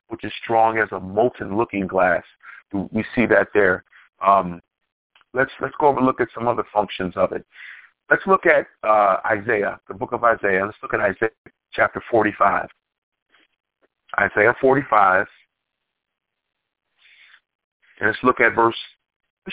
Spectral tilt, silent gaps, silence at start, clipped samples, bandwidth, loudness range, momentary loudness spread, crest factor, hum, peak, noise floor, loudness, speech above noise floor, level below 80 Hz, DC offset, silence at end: -9.5 dB/octave; 4.92-5.10 s, 11.38-11.45 s, 12.98-13.12 s, 13.22-13.26 s, 17.55-17.80 s, 19.16-19.20 s, 19.30-19.37 s; 0.1 s; under 0.1%; 4 kHz; 4 LU; 13 LU; 20 dB; none; -2 dBFS; -53 dBFS; -20 LUFS; 34 dB; -54 dBFS; under 0.1%; 0 s